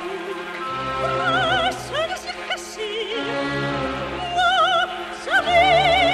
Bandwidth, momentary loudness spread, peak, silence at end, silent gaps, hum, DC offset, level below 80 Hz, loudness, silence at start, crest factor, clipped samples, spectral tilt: 13.5 kHz; 13 LU; -6 dBFS; 0 s; none; none; under 0.1%; -44 dBFS; -21 LUFS; 0 s; 14 dB; under 0.1%; -3.5 dB/octave